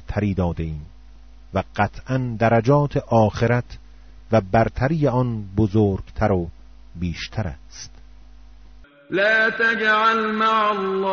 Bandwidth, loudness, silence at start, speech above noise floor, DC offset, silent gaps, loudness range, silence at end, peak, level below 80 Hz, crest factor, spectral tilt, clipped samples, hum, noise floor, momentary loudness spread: 7 kHz; -20 LUFS; 0.1 s; 26 dB; 0.5%; none; 5 LU; 0 s; -4 dBFS; -40 dBFS; 18 dB; -5 dB/octave; under 0.1%; none; -46 dBFS; 14 LU